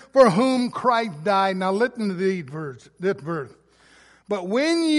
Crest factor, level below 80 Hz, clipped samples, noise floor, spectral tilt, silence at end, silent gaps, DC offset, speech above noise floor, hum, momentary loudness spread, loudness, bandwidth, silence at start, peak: 20 dB; -66 dBFS; under 0.1%; -54 dBFS; -5.5 dB/octave; 0 s; none; under 0.1%; 33 dB; none; 15 LU; -22 LUFS; 11.5 kHz; 0.15 s; -2 dBFS